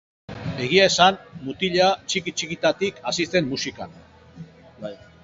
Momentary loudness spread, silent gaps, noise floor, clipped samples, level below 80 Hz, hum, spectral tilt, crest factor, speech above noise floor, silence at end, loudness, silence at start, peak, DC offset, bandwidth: 20 LU; none; -44 dBFS; under 0.1%; -54 dBFS; none; -3.5 dB/octave; 22 dB; 22 dB; 0.3 s; -21 LUFS; 0.3 s; 0 dBFS; under 0.1%; 8 kHz